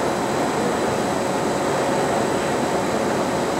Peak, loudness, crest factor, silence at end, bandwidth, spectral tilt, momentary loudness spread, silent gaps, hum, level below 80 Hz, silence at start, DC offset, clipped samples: -8 dBFS; -21 LUFS; 12 dB; 0 s; 16 kHz; -4.5 dB/octave; 1 LU; none; none; -50 dBFS; 0 s; under 0.1%; under 0.1%